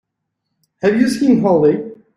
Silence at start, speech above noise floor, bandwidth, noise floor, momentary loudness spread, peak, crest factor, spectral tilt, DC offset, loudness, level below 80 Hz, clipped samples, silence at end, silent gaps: 0.85 s; 62 dB; 14.5 kHz; -75 dBFS; 7 LU; -2 dBFS; 14 dB; -6.5 dB/octave; under 0.1%; -15 LUFS; -56 dBFS; under 0.1%; 0.2 s; none